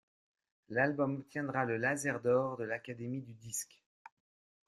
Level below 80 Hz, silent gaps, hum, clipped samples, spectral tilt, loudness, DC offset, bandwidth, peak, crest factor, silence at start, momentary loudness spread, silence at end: -76 dBFS; none; none; under 0.1%; -5.5 dB/octave; -35 LUFS; under 0.1%; 13.5 kHz; -18 dBFS; 20 dB; 0.7 s; 10 LU; 1.05 s